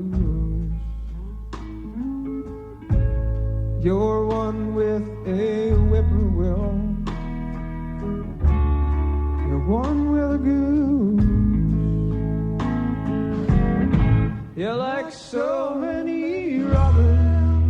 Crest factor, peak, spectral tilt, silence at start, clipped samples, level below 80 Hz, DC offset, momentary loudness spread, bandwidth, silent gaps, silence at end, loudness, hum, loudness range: 14 dB; -6 dBFS; -9.5 dB/octave; 0 s; under 0.1%; -26 dBFS; under 0.1%; 12 LU; 7.2 kHz; none; 0 s; -22 LUFS; none; 4 LU